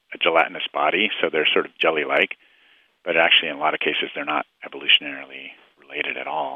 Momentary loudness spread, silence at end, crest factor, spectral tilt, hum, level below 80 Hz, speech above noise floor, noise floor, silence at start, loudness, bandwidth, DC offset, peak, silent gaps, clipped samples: 17 LU; 0 s; 20 dB; -5 dB/octave; none; -70 dBFS; 36 dB; -58 dBFS; 0.1 s; -20 LUFS; 5.8 kHz; under 0.1%; -2 dBFS; none; under 0.1%